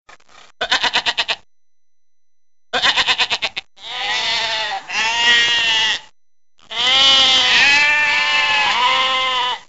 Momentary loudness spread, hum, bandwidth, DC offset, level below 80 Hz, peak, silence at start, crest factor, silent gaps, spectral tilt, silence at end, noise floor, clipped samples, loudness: 14 LU; none; 8.2 kHz; 0.4%; -52 dBFS; 0 dBFS; 0.6 s; 18 dB; none; 1 dB/octave; 0.1 s; -80 dBFS; under 0.1%; -14 LUFS